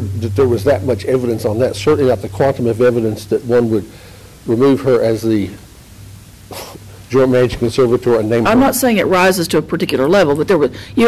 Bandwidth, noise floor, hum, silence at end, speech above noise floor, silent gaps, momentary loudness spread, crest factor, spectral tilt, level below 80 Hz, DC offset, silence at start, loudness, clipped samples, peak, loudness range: 16 kHz; -37 dBFS; none; 0 s; 23 dB; none; 8 LU; 10 dB; -6 dB/octave; -38 dBFS; under 0.1%; 0 s; -14 LUFS; under 0.1%; -6 dBFS; 4 LU